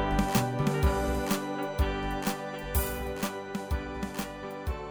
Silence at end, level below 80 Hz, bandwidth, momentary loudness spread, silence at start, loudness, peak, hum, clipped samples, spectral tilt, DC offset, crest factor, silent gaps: 0 s; -36 dBFS; over 20 kHz; 9 LU; 0 s; -31 LUFS; -12 dBFS; none; under 0.1%; -5.5 dB/octave; under 0.1%; 18 dB; none